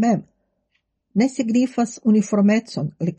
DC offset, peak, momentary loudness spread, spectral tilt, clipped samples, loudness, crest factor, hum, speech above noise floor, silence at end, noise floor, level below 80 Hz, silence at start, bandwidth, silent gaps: under 0.1%; -8 dBFS; 8 LU; -6.5 dB/octave; under 0.1%; -20 LUFS; 14 dB; none; 52 dB; 0.05 s; -72 dBFS; -68 dBFS; 0 s; 8.8 kHz; none